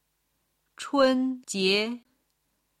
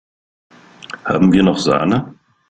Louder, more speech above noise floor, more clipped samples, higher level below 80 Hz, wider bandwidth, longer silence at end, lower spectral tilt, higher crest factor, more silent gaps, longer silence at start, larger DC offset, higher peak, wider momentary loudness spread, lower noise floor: second, -25 LUFS vs -15 LUFS; first, 50 dB vs 22 dB; neither; second, -70 dBFS vs -48 dBFS; first, 13.5 kHz vs 9 kHz; first, 0.8 s vs 0.4 s; second, -3.5 dB/octave vs -6.5 dB/octave; about the same, 18 dB vs 16 dB; neither; about the same, 0.8 s vs 0.9 s; neither; second, -10 dBFS vs -2 dBFS; second, 15 LU vs 19 LU; first, -75 dBFS vs -35 dBFS